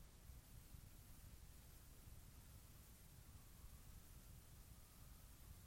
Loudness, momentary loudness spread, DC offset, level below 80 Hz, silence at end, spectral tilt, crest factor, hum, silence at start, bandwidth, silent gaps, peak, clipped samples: -64 LUFS; 1 LU; under 0.1%; -64 dBFS; 0 s; -4 dB/octave; 14 dB; none; 0 s; 16.5 kHz; none; -48 dBFS; under 0.1%